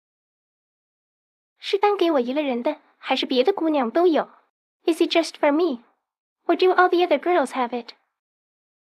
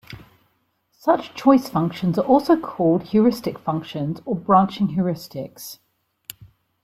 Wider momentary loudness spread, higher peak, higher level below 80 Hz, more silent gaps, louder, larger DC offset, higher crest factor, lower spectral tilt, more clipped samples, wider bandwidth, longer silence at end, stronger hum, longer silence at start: second, 11 LU vs 20 LU; about the same, -4 dBFS vs -2 dBFS; second, -88 dBFS vs -58 dBFS; first, 4.50-4.80 s, 6.18-6.36 s vs none; about the same, -21 LUFS vs -20 LUFS; neither; about the same, 20 dB vs 18 dB; second, -3.5 dB/octave vs -7.5 dB/octave; neither; second, 13 kHz vs 16 kHz; about the same, 1.2 s vs 1.1 s; neither; first, 1.65 s vs 0.1 s